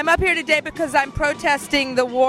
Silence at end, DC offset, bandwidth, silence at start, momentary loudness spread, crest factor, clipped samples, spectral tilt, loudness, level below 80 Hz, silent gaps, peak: 0 s; under 0.1%; 15.5 kHz; 0 s; 4 LU; 16 dB; under 0.1%; -3.5 dB/octave; -19 LUFS; -38 dBFS; none; -4 dBFS